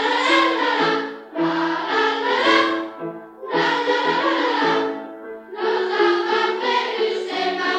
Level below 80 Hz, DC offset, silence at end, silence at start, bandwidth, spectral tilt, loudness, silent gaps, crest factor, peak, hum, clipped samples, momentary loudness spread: -72 dBFS; under 0.1%; 0 s; 0 s; 9.2 kHz; -3.5 dB/octave; -20 LUFS; none; 16 dB; -4 dBFS; none; under 0.1%; 14 LU